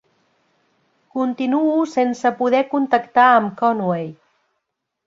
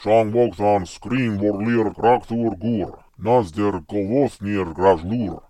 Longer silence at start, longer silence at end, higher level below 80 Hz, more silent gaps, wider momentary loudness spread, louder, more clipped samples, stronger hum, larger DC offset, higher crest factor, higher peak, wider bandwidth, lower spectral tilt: first, 1.15 s vs 0 s; first, 0.95 s vs 0.1 s; second, -68 dBFS vs -48 dBFS; neither; first, 10 LU vs 7 LU; first, -18 LUFS vs -21 LUFS; neither; neither; neither; about the same, 18 dB vs 18 dB; about the same, -2 dBFS vs -2 dBFS; second, 7.8 kHz vs 11.5 kHz; about the same, -6.5 dB/octave vs -7.5 dB/octave